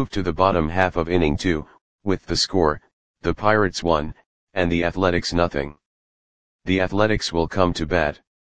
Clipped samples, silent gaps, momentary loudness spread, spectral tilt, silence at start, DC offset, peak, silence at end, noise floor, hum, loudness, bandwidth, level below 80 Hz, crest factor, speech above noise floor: under 0.1%; 1.81-1.99 s, 2.93-3.14 s, 4.26-4.47 s, 5.86-6.59 s; 9 LU; -5.5 dB/octave; 0 s; 1%; 0 dBFS; 0.15 s; under -90 dBFS; none; -22 LUFS; 9.8 kHz; -38 dBFS; 22 dB; over 69 dB